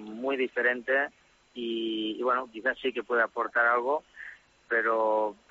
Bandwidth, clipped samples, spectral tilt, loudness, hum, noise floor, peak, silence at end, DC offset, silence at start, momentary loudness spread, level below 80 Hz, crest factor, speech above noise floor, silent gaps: 7.6 kHz; under 0.1%; 0 dB/octave; -28 LUFS; none; -48 dBFS; -12 dBFS; 0.15 s; under 0.1%; 0 s; 10 LU; -72 dBFS; 16 dB; 20 dB; none